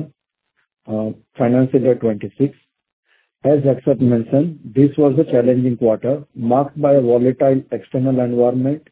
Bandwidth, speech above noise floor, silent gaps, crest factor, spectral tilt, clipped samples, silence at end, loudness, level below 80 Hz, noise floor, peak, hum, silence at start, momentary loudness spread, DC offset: 4 kHz; 54 dB; 2.93-3.03 s; 16 dB; -13 dB/octave; under 0.1%; 0.1 s; -17 LUFS; -58 dBFS; -70 dBFS; 0 dBFS; none; 0 s; 8 LU; under 0.1%